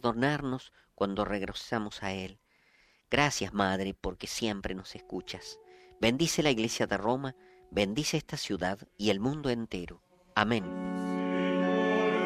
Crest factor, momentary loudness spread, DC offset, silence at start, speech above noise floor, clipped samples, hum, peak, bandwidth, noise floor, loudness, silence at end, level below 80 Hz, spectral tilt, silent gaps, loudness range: 26 dB; 13 LU; under 0.1%; 0.05 s; 34 dB; under 0.1%; none; -6 dBFS; 14 kHz; -66 dBFS; -31 LUFS; 0 s; -56 dBFS; -4.5 dB/octave; none; 2 LU